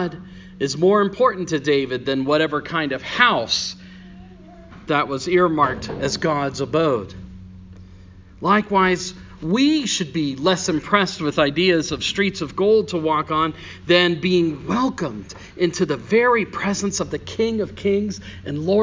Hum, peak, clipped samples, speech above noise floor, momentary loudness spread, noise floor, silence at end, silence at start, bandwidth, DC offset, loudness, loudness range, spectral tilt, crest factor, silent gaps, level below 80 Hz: none; 0 dBFS; under 0.1%; 23 dB; 12 LU; -43 dBFS; 0 s; 0 s; 7.6 kHz; under 0.1%; -20 LUFS; 3 LU; -4.5 dB/octave; 20 dB; none; -48 dBFS